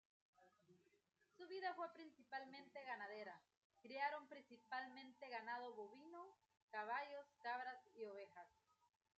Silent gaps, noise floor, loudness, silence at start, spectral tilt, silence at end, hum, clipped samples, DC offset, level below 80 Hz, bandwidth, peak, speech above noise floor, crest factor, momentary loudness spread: 3.57-3.70 s, 6.62-6.68 s; -77 dBFS; -53 LUFS; 0.4 s; 0 dB/octave; 0.7 s; none; under 0.1%; under 0.1%; under -90 dBFS; 8 kHz; -34 dBFS; 24 dB; 22 dB; 15 LU